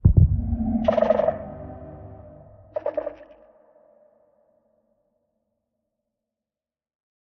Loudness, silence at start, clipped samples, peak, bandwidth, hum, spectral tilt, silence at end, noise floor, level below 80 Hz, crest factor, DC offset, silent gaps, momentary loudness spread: -23 LUFS; 0.05 s; under 0.1%; -2 dBFS; 4.6 kHz; none; -9.5 dB/octave; 4.1 s; under -90 dBFS; -34 dBFS; 24 dB; under 0.1%; none; 23 LU